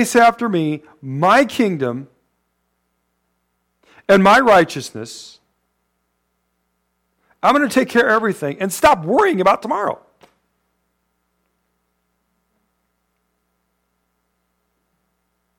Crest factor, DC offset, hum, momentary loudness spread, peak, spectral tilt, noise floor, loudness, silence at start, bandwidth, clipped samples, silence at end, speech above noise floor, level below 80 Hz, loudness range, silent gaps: 16 dB; under 0.1%; 60 Hz at -55 dBFS; 19 LU; -4 dBFS; -5 dB/octave; -70 dBFS; -15 LUFS; 0 s; 17.5 kHz; under 0.1%; 5.65 s; 55 dB; -54 dBFS; 6 LU; none